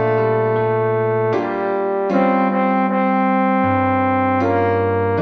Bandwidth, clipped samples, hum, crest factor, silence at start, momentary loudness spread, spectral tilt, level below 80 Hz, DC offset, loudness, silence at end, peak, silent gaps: 6.2 kHz; under 0.1%; none; 12 dB; 0 s; 3 LU; -9.5 dB/octave; -62 dBFS; under 0.1%; -17 LUFS; 0 s; -4 dBFS; none